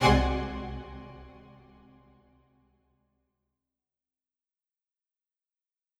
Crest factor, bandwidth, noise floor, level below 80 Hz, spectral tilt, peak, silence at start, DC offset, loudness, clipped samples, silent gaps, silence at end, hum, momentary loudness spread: 26 dB; 14.5 kHz; -90 dBFS; -40 dBFS; -6 dB/octave; -8 dBFS; 0 s; under 0.1%; -30 LUFS; under 0.1%; none; 4.7 s; none; 26 LU